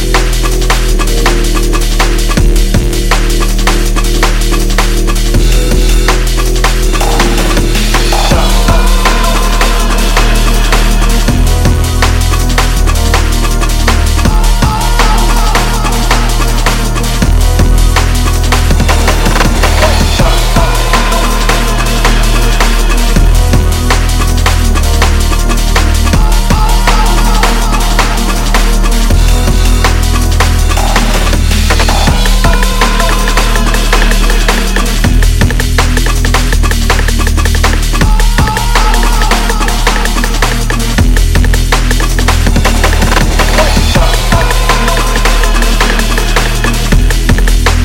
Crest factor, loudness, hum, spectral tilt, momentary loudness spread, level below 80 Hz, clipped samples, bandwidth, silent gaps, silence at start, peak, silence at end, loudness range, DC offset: 8 dB; -10 LUFS; none; -4 dB/octave; 2 LU; -8 dBFS; 0.9%; 16.5 kHz; none; 0 s; 0 dBFS; 0 s; 1 LU; under 0.1%